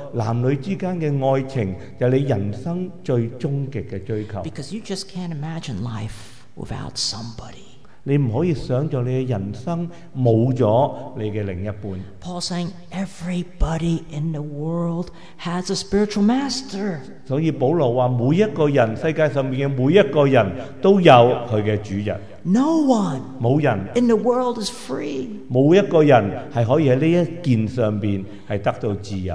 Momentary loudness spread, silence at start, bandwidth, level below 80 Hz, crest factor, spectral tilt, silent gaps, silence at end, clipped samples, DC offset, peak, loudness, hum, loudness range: 13 LU; 0 s; 11 kHz; -42 dBFS; 20 dB; -7 dB/octave; none; 0 s; under 0.1%; 1%; 0 dBFS; -20 LUFS; none; 10 LU